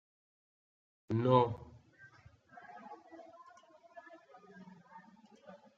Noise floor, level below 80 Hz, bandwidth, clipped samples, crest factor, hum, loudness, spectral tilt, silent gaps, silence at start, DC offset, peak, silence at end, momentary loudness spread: -62 dBFS; -72 dBFS; 7.2 kHz; under 0.1%; 24 dB; none; -32 LUFS; -7 dB/octave; none; 1.1 s; under 0.1%; -16 dBFS; 0.2 s; 29 LU